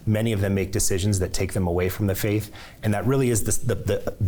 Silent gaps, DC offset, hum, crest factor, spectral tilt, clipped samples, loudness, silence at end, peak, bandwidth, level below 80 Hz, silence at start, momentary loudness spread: none; under 0.1%; none; 12 dB; -5.5 dB/octave; under 0.1%; -24 LUFS; 0 s; -10 dBFS; over 20 kHz; -38 dBFS; 0 s; 5 LU